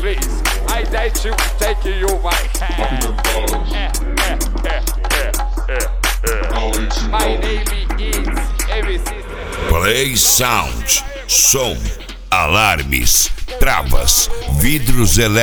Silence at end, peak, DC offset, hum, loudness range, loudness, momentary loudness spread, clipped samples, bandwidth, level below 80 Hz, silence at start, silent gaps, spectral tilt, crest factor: 0 s; 0 dBFS; under 0.1%; none; 6 LU; -16 LUFS; 9 LU; under 0.1%; over 20 kHz; -18 dBFS; 0 s; none; -2.5 dB/octave; 14 dB